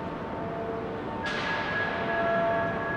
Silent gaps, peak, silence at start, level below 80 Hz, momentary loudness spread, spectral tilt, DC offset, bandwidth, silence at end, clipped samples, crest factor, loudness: none; -16 dBFS; 0 s; -52 dBFS; 8 LU; -6 dB/octave; under 0.1%; 9.6 kHz; 0 s; under 0.1%; 14 dB; -29 LUFS